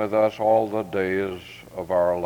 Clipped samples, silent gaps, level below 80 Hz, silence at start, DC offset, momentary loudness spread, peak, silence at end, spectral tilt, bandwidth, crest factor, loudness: under 0.1%; none; -60 dBFS; 0 s; under 0.1%; 15 LU; -8 dBFS; 0 s; -7 dB/octave; 19.5 kHz; 14 dB; -23 LUFS